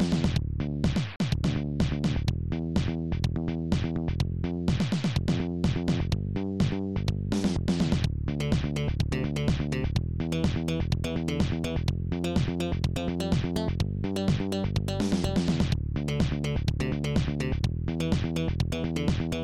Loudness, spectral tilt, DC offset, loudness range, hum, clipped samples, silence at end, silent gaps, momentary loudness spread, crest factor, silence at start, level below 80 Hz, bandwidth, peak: -29 LUFS; -7 dB/octave; under 0.1%; 1 LU; none; under 0.1%; 0 s; none; 3 LU; 14 dB; 0 s; -36 dBFS; 14.5 kHz; -14 dBFS